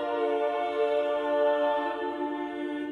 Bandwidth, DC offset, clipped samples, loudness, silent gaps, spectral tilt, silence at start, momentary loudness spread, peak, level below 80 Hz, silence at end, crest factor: 6.8 kHz; under 0.1%; under 0.1%; -28 LUFS; none; -5 dB/octave; 0 s; 8 LU; -16 dBFS; -72 dBFS; 0 s; 12 dB